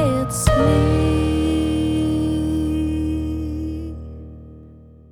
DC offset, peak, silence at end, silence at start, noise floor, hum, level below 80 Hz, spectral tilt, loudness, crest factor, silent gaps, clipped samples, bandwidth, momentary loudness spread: under 0.1%; -2 dBFS; 0.3 s; 0 s; -43 dBFS; none; -28 dBFS; -6.5 dB/octave; -20 LUFS; 18 dB; none; under 0.1%; 16.5 kHz; 18 LU